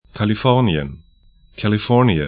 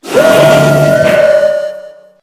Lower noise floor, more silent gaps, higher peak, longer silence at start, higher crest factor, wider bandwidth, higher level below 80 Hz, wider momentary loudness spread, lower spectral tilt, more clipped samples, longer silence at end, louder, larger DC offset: first, -51 dBFS vs -30 dBFS; neither; about the same, 0 dBFS vs 0 dBFS; about the same, 0.15 s vs 0.05 s; first, 18 dB vs 8 dB; second, 4.9 kHz vs 16 kHz; about the same, -40 dBFS vs -42 dBFS; about the same, 9 LU vs 9 LU; first, -12.5 dB/octave vs -5.5 dB/octave; second, under 0.1% vs 1%; second, 0 s vs 0.35 s; second, -18 LUFS vs -8 LUFS; neither